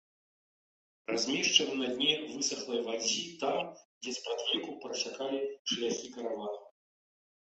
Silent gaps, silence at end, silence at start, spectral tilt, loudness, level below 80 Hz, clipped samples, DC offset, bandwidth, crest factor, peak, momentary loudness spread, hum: 3.85-4.01 s, 5.59-5.65 s; 0.9 s; 1.1 s; -1.5 dB/octave; -32 LUFS; -80 dBFS; under 0.1%; under 0.1%; 8.4 kHz; 26 dB; -8 dBFS; 13 LU; none